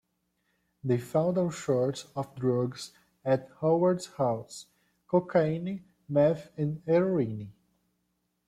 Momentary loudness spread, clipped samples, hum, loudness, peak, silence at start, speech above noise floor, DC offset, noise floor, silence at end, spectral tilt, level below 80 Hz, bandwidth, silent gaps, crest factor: 14 LU; under 0.1%; none; -29 LUFS; -12 dBFS; 0.85 s; 50 dB; under 0.1%; -78 dBFS; 0.95 s; -7 dB/octave; -68 dBFS; 14.5 kHz; none; 18 dB